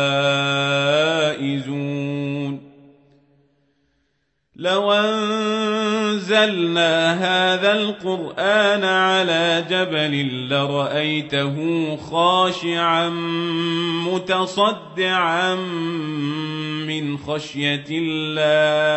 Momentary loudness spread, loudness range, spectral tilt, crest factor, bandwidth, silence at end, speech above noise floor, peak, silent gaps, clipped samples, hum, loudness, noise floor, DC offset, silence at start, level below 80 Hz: 8 LU; 6 LU; -5 dB/octave; 16 dB; 8.4 kHz; 0 s; 50 dB; -4 dBFS; none; under 0.1%; none; -20 LUFS; -70 dBFS; under 0.1%; 0 s; -64 dBFS